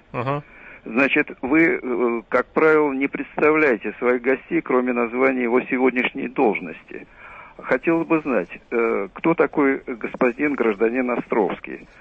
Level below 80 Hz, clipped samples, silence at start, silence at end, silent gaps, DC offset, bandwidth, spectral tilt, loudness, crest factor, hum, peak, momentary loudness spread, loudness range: -56 dBFS; under 0.1%; 0.15 s; 0.15 s; none; under 0.1%; 6.4 kHz; -8 dB/octave; -21 LUFS; 16 dB; none; -6 dBFS; 12 LU; 3 LU